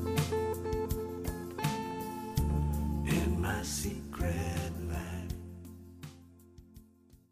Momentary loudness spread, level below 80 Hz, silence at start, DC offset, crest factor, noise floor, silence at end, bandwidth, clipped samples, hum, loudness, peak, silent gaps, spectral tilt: 16 LU; -42 dBFS; 0 s; under 0.1%; 18 dB; -61 dBFS; 0.15 s; 15.5 kHz; under 0.1%; none; -35 LUFS; -18 dBFS; none; -5.5 dB/octave